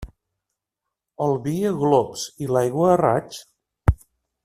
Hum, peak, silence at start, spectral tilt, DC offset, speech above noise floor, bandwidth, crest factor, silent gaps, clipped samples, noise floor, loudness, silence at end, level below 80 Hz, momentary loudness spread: none; -2 dBFS; 0 s; -6.5 dB/octave; under 0.1%; 63 dB; 15 kHz; 20 dB; none; under 0.1%; -84 dBFS; -22 LUFS; 0.5 s; -38 dBFS; 12 LU